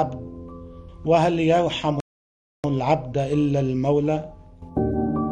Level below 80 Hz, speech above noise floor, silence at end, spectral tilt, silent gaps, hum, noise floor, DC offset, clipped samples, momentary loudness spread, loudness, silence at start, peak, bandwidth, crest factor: -44 dBFS; over 69 dB; 0 s; -7.5 dB/octave; 2.01-2.63 s; none; under -90 dBFS; under 0.1%; under 0.1%; 19 LU; -23 LUFS; 0 s; -6 dBFS; 9.2 kHz; 16 dB